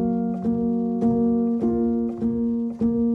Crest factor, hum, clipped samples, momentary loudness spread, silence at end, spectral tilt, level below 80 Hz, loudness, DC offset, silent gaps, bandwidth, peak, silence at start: 10 dB; none; under 0.1%; 3 LU; 0 s; -11.5 dB/octave; -46 dBFS; -23 LUFS; under 0.1%; none; 2 kHz; -12 dBFS; 0 s